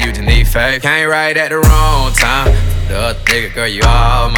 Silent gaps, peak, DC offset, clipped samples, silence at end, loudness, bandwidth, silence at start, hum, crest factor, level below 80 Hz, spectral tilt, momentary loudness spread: none; 0 dBFS; under 0.1%; under 0.1%; 0 s; -12 LUFS; 19 kHz; 0 s; none; 10 dB; -14 dBFS; -4 dB/octave; 5 LU